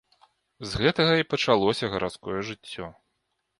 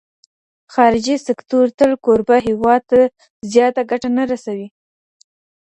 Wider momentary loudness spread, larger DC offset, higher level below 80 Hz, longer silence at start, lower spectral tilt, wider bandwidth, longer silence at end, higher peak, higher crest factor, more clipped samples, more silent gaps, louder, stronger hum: first, 16 LU vs 10 LU; neither; about the same, -52 dBFS vs -52 dBFS; about the same, 0.6 s vs 0.7 s; about the same, -5 dB/octave vs -5 dB/octave; first, 11.5 kHz vs 8.6 kHz; second, 0.65 s vs 1 s; second, -6 dBFS vs 0 dBFS; first, 22 dB vs 16 dB; neither; second, none vs 1.74-1.78 s, 3.30-3.40 s; second, -25 LUFS vs -16 LUFS; neither